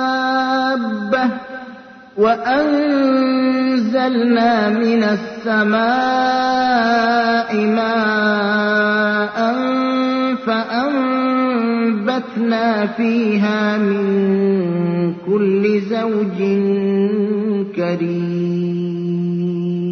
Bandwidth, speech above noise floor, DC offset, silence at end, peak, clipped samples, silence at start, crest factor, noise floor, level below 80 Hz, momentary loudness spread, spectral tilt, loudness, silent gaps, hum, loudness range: 6.4 kHz; 22 dB; under 0.1%; 0 s; -4 dBFS; under 0.1%; 0 s; 12 dB; -37 dBFS; -60 dBFS; 5 LU; -7 dB/octave; -17 LUFS; none; none; 2 LU